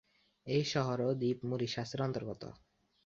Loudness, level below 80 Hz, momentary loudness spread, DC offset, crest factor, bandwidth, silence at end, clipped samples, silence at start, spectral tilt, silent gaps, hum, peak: -36 LUFS; -68 dBFS; 14 LU; under 0.1%; 18 dB; 7.6 kHz; 0.5 s; under 0.1%; 0.45 s; -5.5 dB/octave; none; none; -18 dBFS